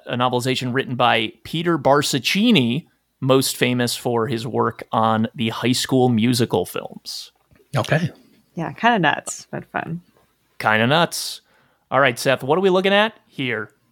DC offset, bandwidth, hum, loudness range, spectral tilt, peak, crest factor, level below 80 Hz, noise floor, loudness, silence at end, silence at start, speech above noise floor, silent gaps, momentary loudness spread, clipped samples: under 0.1%; 18 kHz; none; 4 LU; -4.5 dB/octave; 0 dBFS; 20 dB; -64 dBFS; -61 dBFS; -20 LUFS; 0.25 s; 0.05 s; 41 dB; none; 13 LU; under 0.1%